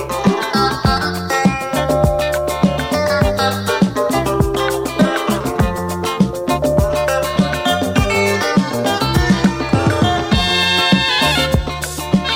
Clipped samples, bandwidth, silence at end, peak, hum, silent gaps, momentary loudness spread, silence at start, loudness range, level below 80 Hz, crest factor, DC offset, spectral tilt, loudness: under 0.1%; 16.5 kHz; 0 s; -2 dBFS; none; none; 5 LU; 0 s; 3 LU; -28 dBFS; 14 dB; under 0.1%; -5 dB/octave; -16 LUFS